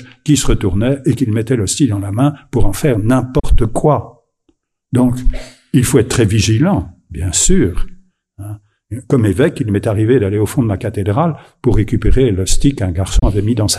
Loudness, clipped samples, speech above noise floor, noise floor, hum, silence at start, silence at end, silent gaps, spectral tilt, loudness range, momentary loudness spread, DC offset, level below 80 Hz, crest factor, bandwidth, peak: -15 LUFS; under 0.1%; 48 dB; -61 dBFS; none; 0 s; 0 s; none; -5.5 dB/octave; 2 LU; 10 LU; under 0.1%; -22 dBFS; 14 dB; 14.5 kHz; 0 dBFS